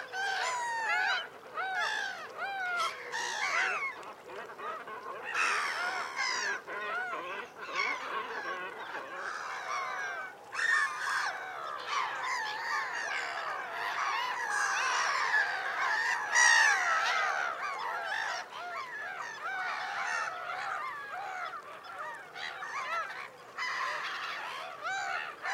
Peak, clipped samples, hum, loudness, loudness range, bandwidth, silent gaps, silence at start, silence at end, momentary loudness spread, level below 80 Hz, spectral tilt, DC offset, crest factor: -12 dBFS; under 0.1%; none; -32 LUFS; 10 LU; 16 kHz; none; 0 s; 0 s; 12 LU; -86 dBFS; 1 dB/octave; under 0.1%; 22 dB